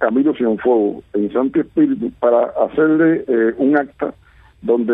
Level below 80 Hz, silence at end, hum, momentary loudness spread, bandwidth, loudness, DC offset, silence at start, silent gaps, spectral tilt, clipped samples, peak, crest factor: -54 dBFS; 0 s; none; 7 LU; 3.8 kHz; -17 LUFS; under 0.1%; 0 s; none; -10 dB/octave; under 0.1%; -2 dBFS; 14 dB